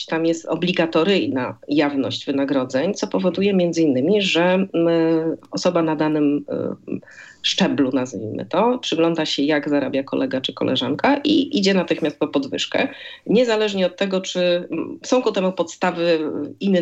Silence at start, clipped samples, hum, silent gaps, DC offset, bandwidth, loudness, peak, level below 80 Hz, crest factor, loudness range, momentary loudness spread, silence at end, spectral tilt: 0 s; under 0.1%; none; none; under 0.1%; 8.2 kHz; -20 LUFS; -4 dBFS; -68 dBFS; 14 dB; 2 LU; 7 LU; 0 s; -5 dB/octave